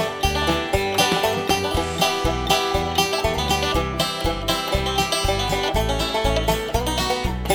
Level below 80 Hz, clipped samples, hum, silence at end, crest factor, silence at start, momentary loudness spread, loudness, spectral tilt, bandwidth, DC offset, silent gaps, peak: -30 dBFS; under 0.1%; none; 0 s; 18 dB; 0 s; 3 LU; -21 LUFS; -3.5 dB/octave; 19 kHz; under 0.1%; none; -4 dBFS